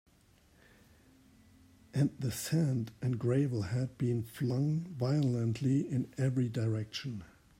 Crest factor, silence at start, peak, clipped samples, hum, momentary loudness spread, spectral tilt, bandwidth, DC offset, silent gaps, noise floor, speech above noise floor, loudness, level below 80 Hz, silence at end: 14 dB; 1.95 s; -20 dBFS; under 0.1%; none; 6 LU; -7 dB/octave; 16 kHz; under 0.1%; none; -65 dBFS; 33 dB; -34 LUFS; -66 dBFS; 0.35 s